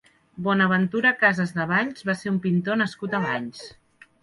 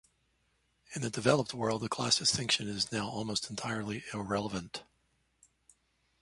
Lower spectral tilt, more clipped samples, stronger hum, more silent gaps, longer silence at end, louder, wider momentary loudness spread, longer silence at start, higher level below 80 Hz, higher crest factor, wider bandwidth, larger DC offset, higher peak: first, -6.5 dB/octave vs -3.5 dB/octave; neither; neither; neither; second, 0.55 s vs 1.4 s; first, -23 LUFS vs -32 LUFS; about the same, 10 LU vs 12 LU; second, 0.35 s vs 0.9 s; about the same, -64 dBFS vs -64 dBFS; second, 18 dB vs 24 dB; about the same, 11.5 kHz vs 11.5 kHz; neither; first, -6 dBFS vs -12 dBFS